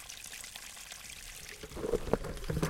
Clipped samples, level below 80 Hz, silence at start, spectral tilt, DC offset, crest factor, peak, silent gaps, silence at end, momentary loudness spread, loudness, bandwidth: under 0.1%; -46 dBFS; 0 s; -4.5 dB/octave; under 0.1%; 28 dB; -10 dBFS; none; 0 s; 10 LU; -40 LUFS; 17 kHz